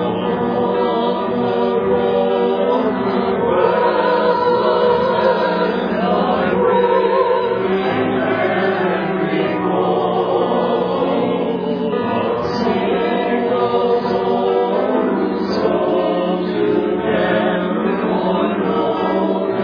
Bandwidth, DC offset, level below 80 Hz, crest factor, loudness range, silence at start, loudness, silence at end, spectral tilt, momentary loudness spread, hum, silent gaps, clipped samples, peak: 5.4 kHz; under 0.1%; -50 dBFS; 14 dB; 2 LU; 0 s; -17 LUFS; 0 s; -8 dB/octave; 4 LU; none; none; under 0.1%; -2 dBFS